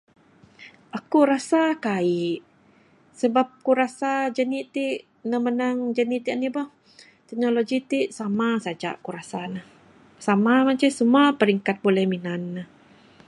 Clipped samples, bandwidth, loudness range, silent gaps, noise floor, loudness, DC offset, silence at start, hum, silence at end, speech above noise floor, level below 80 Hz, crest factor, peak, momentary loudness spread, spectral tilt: under 0.1%; 11.5 kHz; 5 LU; none; -57 dBFS; -23 LUFS; under 0.1%; 0.6 s; none; 0.6 s; 34 dB; -74 dBFS; 18 dB; -6 dBFS; 14 LU; -6 dB/octave